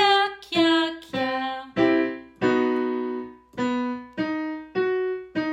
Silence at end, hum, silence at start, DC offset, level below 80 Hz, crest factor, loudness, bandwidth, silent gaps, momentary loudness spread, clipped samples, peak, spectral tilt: 0 s; none; 0 s; under 0.1%; -62 dBFS; 18 dB; -25 LUFS; 10.5 kHz; none; 9 LU; under 0.1%; -6 dBFS; -5 dB/octave